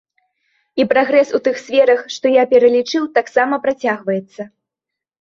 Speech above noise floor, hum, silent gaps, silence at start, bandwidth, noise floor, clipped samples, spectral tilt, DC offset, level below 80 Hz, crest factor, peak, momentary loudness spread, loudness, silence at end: 69 dB; none; none; 0.75 s; 7.4 kHz; -84 dBFS; under 0.1%; -4.5 dB/octave; under 0.1%; -62 dBFS; 16 dB; -2 dBFS; 11 LU; -15 LUFS; 0.75 s